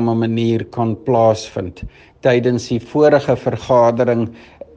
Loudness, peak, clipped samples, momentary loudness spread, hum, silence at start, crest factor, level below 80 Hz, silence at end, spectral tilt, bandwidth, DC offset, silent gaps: -16 LUFS; 0 dBFS; under 0.1%; 13 LU; none; 0 s; 16 dB; -46 dBFS; 0.4 s; -7 dB/octave; 8.6 kHz; under 0.1%; none